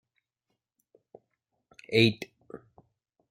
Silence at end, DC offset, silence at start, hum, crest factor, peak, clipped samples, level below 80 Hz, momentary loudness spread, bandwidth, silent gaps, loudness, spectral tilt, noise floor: 0.75 s; under 0.1%; 1.9 s; none; 26 dB; -6 dBFS; under 0.1%; -68 dBFS; 26 LU; 15.5 kHz; none; -25 LUFS; -6 dB/octave; -83 dBFS